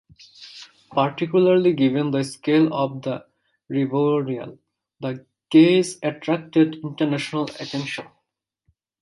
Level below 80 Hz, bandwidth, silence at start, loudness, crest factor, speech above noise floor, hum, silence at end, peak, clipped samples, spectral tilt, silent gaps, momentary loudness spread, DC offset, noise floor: -68 dBFS; 11.5 kHz; 0.4 s; -21 LUFS; 18 dB; 57 dB; none; 1 s; -4 dBFS; under 0.1%; -6.5 dB/octave; none; 16 LU; under 0.1%; -78 dBFS